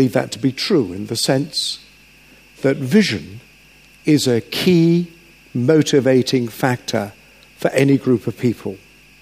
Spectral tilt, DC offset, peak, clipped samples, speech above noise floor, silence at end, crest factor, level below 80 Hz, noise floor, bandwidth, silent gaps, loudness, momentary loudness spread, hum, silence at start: -5.5 dB/octave; under 0.1%; 0 dBFS; under 0.1%; 31 dB; 0.45 s; 18 dB; -56 dBFS; -48 dBFS; 15.5 kHz; none; -18 LUFS; 13 LU; none; 0 s